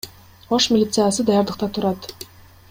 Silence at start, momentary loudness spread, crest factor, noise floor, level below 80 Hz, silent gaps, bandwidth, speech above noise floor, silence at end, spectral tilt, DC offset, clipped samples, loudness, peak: 0.05 s; 20 LU; 16 dB; -41 dBFS; -52 dBFS; none; 16.5 kHz; 23 dB; 0.45 s; -4.5 dB/octave; under 0.1%; under 0.1%; -19 LUFS; -6 dBFS